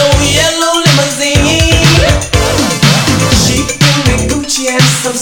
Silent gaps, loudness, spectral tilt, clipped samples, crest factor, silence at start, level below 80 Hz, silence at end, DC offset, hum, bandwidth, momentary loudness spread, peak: none; -9 LUFS; -3.5 dB/octave; 0.4%; 10 dB; 0 s; -20 dBFS; 0 s; under 0.1%; none; 19.5 kHz; 4 LU; 0 dBFS